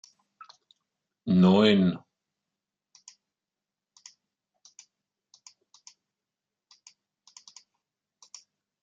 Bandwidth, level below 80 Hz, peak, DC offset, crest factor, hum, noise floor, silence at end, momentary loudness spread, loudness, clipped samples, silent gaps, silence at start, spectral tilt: 7.6 kHz; -74 dBFS; -8 dBFS; under 0.1%; 24 dB; none; -90 dBFS; 6.85 s; 30 LU; -22 LUFS; under 0.1%; none; 1.25 s; -7 dB/octave